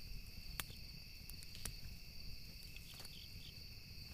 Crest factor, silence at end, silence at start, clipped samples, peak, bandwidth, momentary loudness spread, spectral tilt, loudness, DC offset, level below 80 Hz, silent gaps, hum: 34 dB; 0 s; 0 s; under 0.1%; -16 dBFS; 15.5 kHz; 6 LU; -2.5 dB/octave; -52 LUFS; under 0.1%; -56 dBFS; none; none